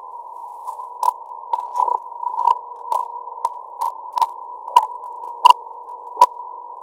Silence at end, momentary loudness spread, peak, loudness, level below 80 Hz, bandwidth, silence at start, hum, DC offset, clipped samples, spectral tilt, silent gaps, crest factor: 0 s; 18 LU; 0 dBFS; -20 LUFS; -76 dBFS; 17 kHz; 0 s; none; under 0.1%; under 0.1%; 1 dB/octave; none; 22 dB